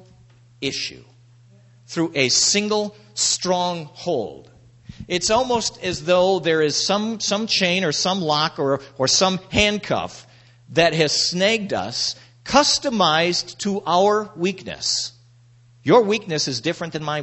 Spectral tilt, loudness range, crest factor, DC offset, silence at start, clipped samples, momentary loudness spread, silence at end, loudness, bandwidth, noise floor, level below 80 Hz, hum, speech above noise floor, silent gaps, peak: -3 dB/octave; 3 LU; 20 dB; under 0.1%; 0.6 s; under 0.1%; 9 LU; 0 s; -20 LUFS; 8.4 kHz; -52 dBFS; -50 dBFS; none; 31 dB; none; -2 dBFS